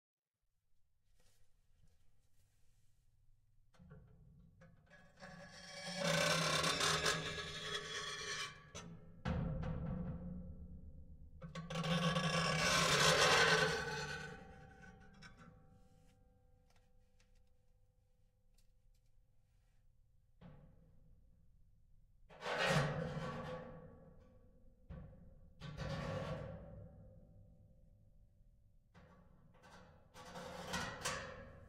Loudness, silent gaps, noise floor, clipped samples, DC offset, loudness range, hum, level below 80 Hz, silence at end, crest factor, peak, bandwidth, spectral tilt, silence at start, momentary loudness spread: -37 LUFS; none; -84 dBFS; under 0.1%; under 0.1%; 18 LU; none; -60 dBFS; 0 s; 24 dB; -18 dBFS; 16 kHz; -3 dB/octave; 1.4 s; 26 LU